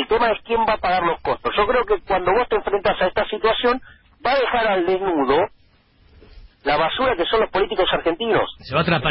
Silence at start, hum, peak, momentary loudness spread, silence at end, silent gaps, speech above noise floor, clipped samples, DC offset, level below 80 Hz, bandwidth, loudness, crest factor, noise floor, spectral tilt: 0 s; none; -6 dBFS; 3 LU; 0 s; none; 36 dB; under 0.1%; under 0.1%; -44 dBFS; 5.8 kHz; -20 LUFS; 14 dB; -55 dBFS; -10 dB/octave